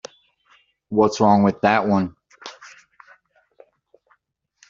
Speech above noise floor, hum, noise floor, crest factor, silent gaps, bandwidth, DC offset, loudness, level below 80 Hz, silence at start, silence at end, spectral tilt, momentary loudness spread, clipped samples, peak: 51 dB; none; -68 dBFS; 20 dB; none; 7.4 kHz; under 0.1%; -19 LUFS; -60 dBFS; 0.9 s; 2.05 s; -5.5 dB/octave; 24 LU; under 0.1%; -2 dBFS